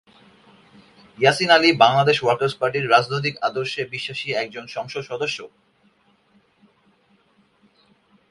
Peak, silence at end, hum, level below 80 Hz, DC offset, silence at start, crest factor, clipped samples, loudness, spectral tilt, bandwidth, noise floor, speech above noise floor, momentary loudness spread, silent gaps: 0 dBFS; 2.85 s; none; -64 dBFS; under 0.1%; 1.2 s; 22 dB; under 0.1%; -20 LUFS; -4.5 dB/octave; 11.5 kHz; -61 dBFS; 40 dB; 15 LU; none